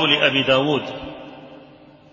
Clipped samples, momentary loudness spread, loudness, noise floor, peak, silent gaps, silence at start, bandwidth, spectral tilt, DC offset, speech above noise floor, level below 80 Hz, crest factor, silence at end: under 0.1%; 22 LU; -17 LUFS; -47 dBFS; -2 dBFS; none; 0 s; 7.4 kHz; -5 dB/octave; under 0.1%; 28 dB; -54 dBFS; 20 dB; 0.5 s